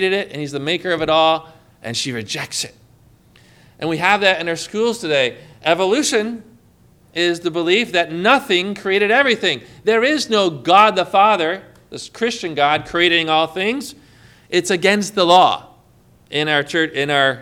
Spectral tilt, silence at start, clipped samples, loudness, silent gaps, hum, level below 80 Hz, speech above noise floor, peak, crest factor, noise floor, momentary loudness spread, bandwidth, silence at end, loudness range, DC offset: -3.5 dB/octave; 0 s; under 0.1%; -17 LUFS; none; none; -56 dBFS; 34 dB; 0 dBFS; 18 dB; -51 dBFS; 11 LU; 16.5 kHz; 0 s; 6 LU; under 0.1%